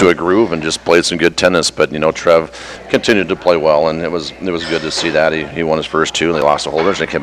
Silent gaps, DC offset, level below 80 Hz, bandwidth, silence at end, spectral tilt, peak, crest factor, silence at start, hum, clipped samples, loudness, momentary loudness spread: none; under 0.1%; -42 dBFS; 15 kHz; 0 s; -4 dB/octave; 0 dBFS; 14 dB; 0 s; none; under 0.1%; -14 LUFS; 7 LU